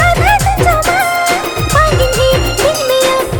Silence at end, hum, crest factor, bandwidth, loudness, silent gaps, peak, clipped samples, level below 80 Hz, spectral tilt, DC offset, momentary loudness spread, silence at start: 0 s; none; 10 dB; over 20 kHz; -11 LUFS; none; 0 dBFS; under 0.1%; -22 dBFS; -4 dB/octave; under 0.1%; 3 LU; 0 s